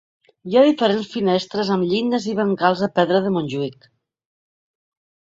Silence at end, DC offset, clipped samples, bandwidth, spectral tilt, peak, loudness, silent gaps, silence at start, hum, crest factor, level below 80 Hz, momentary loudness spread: 1.5 s; under 0.1%; under 0.1%; 7.8 kHz; -6.5 dB/octave; -2 dBFS; -19 LUFS; none; 0.45 s; none; 18 dB; -64 dBFS; 9 LU